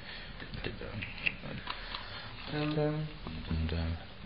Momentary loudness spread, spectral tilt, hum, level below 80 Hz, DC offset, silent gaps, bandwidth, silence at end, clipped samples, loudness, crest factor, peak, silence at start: 10 LU; -4.5 dB/octave; none; -46 dBFS; 0.3%; none; 5.4 kHz; 0 s; under 0.1%; -37 LUFS; 24 dB; -12 dBFS; 0 s